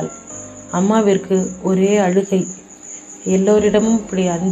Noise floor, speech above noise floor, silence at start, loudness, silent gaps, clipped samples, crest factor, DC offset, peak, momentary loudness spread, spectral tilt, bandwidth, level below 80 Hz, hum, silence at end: -36 dBFS; 21 dB; 0 s; -16 LUFS; none; under 0.1%; 16 dB; under 0.1%; -2 dBFS; 18 LU; -6 dB/octave; 8.4 kHz; -50 dBFS; none; 0 s